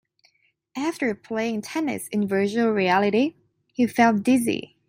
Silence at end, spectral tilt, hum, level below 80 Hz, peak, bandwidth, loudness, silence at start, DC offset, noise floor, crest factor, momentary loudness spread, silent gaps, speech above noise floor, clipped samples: 0.2 s; -5.5 dB/octave; none; -68 dBFS; -6 dBFS; 16 kHz; -23 LUFS; 0.75 s; under 0.1%; -65 dBFS; 18 dB; 8 LU; none; 43 dB; under 0.1%